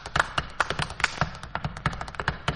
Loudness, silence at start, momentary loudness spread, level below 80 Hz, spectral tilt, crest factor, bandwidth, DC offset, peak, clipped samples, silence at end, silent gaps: -29 LUFS; 0 s; 5 LU; -42 dBFS; -4 dB/octave; 24 dB; 11.5 kHz; under 0.1%; -4 dBFS; under 0.1%; 0 s; none